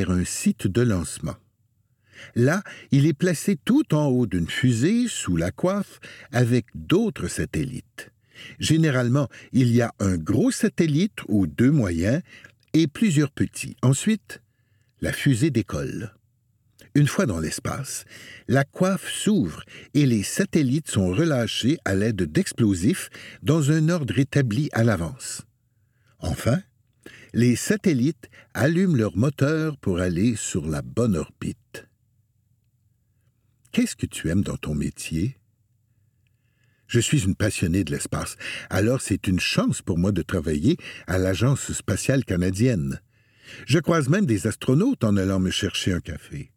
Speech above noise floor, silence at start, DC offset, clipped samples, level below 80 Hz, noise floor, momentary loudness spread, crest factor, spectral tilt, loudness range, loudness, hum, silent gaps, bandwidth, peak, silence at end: 44 dB; 0 s; under 0.1%; under 0.1%; -46 dBFS; -67 dBFS; 11 LU; 18 dB; -5.5 dB/octave; 5 LU; -23 LUFS; none; none; 16.5 kHz; -4 dBFS; 0.1 s